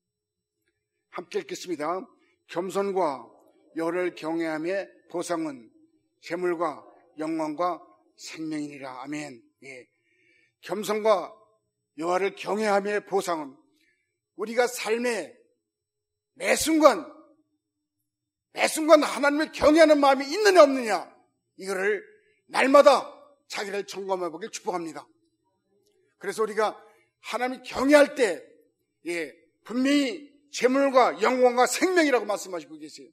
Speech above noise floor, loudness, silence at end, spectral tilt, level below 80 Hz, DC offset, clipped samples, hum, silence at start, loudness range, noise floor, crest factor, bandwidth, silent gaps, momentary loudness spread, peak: 61 dB; -24 LUFS; 0.1 s; -3.5 dB/octave; -64 dBFS; under 0.1%; under 0.1%; none; 1.15 s; 11 LU; -86 dBFS; 26 dB; 16 kHz; none; 20 LU; 0 dBFS